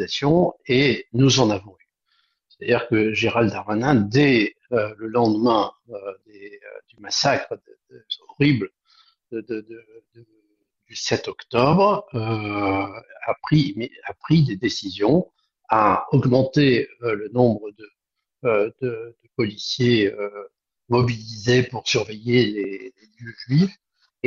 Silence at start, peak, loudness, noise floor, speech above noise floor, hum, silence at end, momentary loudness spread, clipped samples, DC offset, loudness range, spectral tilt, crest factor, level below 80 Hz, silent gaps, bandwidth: 0 s; -2 dBFS; -21 LUFS; -69 dBFS; 48 dB; none; 0 s; 17 LU; under 0.1%; under 0.1%; 5 LU; -5.5 dB/octave; 20 dB; -54 dBFS; none; 7.6 kHz